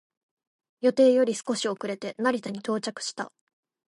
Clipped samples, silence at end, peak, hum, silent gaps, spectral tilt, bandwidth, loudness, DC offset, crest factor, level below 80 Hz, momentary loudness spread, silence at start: under 0.1%; 0.6 s; -10 dBFS; none; none; -4 dB/octave; 11.5 kHz; -26 LUFS; under 0.1%; 18 dB; -80 dBFS; 13 LU; 0.8 s